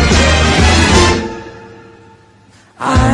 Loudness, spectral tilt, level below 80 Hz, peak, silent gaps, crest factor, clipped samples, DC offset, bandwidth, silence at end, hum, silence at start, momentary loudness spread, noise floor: -10 LUFS; -4.5 dB/octave; -20 dBFS; 0 dBFS; none; 12 dB; under 0.1%; under 0.1%; 11.5 kHz; 0 s; none; 0 s; 17 LU; -45 dBFS